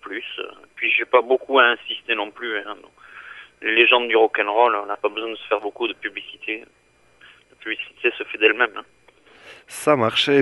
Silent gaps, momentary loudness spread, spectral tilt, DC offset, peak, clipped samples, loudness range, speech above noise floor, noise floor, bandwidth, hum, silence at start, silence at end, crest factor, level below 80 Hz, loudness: none; 20 LU; -4 dB/octave; under 0.1%; 0 dBFS; under 0.1%; 7 LU; 32 dB; -53 dBFS; 11.5 kHz; 60 Hz at -70 dBFS; 0.05 s; 0 s; 22 dB; -70 dBFS; -20 LUFS